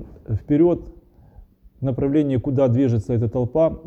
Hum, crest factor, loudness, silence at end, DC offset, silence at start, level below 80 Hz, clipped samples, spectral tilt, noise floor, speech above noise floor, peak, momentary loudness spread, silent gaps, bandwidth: none; 14 dB; -21 LUFS; 0.05 s; under 0.1%; 0 s; -44 dBFS; under 0.1%; -10.5 dB/octave; -47 dBFS; 28 dB; -6 dBFS; 10 LU; none; 8 kHz